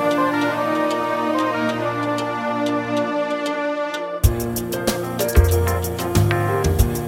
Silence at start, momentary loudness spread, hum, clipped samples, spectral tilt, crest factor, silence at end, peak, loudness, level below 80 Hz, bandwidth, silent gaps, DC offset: 0 s; 5 LU; none; under 0.1%; -5.5 dB/octave; 18 dB; 0 s; -2 dBFS; -21 LUFS; -28 dBFS; 16.5 kHz; none; under 0.1%